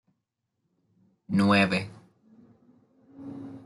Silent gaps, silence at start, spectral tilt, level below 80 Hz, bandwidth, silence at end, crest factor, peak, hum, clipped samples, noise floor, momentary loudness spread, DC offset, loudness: none; 1.3 s; -6.5 dB/octave; -70 dBFS; 11.5 kHz; 0.05 s; 22 dB; -8 dBFS; none; under 0.1%; -81 dBFS; 22 LU; under 0.1%; -24 LUFS